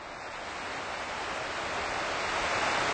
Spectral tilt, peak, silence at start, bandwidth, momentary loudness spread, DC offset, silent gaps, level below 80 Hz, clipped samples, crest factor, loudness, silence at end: -2 dB/octave; -18 dBFS; 0 s; 9.4 kHz; 9 LU; under 0.1%; none; -56 dBFS; under 0.1%; 16 dB; -32 LUFS; 0 s